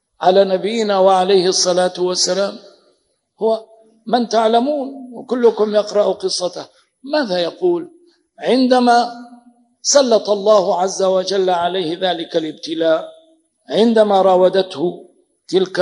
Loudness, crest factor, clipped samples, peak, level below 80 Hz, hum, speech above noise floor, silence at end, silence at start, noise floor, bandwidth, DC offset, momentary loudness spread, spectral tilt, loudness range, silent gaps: -16 LUFS; 16 dB; under 0.1%; 0 dBFS; -76 dBFS; none; 47 dB; 0 s; 0.2 s; -62 dBFS; 10.5 kHz; under 0.1%; 11 LU; -3.5 dB/octave; 3 LU; none